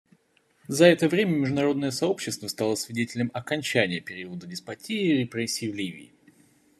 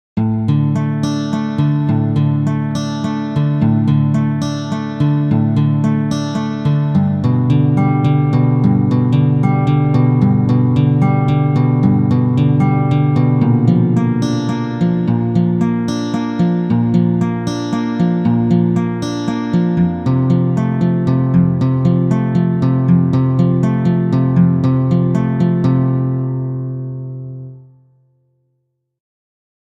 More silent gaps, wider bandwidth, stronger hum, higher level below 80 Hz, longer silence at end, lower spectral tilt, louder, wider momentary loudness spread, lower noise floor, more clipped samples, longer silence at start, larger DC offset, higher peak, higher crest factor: neither; first, 14 kHz vs 7.8 kHz; neither; second, -70 dBFS vs -44 dBFS; second, 0.75 s vs 2.15 s; second, -5 dB/octave vs -9 dB/octave; second, -25 LUFS vs -15 LUFS; first, 17 LU vs 6 LU; about the same, -66 dBFS vs -68 dBFS; neither; first, 0.7 s vs 0.15 s; neither; second, -4 dBFS vs 0 dBFS; first, 24 dB vs 14 dB